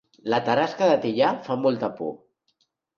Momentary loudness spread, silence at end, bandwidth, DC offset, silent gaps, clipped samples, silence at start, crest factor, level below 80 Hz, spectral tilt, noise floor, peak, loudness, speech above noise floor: 9 LU; 0.8 s; 7 kHz; under 0.1%; none; under 0.1%; 0.25 s; 18 dB; -70 dBFS; -6 dB/octave; -71 dBFS; -8 dBFS; -24 LUFS; 49 dB